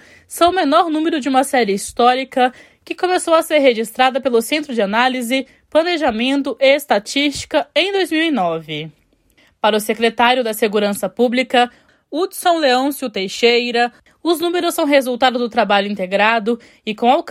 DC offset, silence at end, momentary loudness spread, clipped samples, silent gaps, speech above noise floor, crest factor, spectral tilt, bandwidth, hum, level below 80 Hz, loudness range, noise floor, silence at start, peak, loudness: under 0.1%; 0 s; 7 LU; under 0.1%; none; 39 dB; 16 dB; -3.5 dB/octave; 16 kHz; none; -56 dBFS; 2 LU; -56 dBFS; 0.3 s; 0 dBFS; -16 LUFS